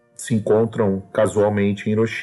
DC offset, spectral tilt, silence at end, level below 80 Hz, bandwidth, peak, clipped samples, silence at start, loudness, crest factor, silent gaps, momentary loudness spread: under 0.1%; -6.5 dB/octave; 0 s; -58 dBFS; 12 kHz; -6 dBFS; under 0.1%; 0.2 s; -20 LUFS; 12 dB; none; 4 LU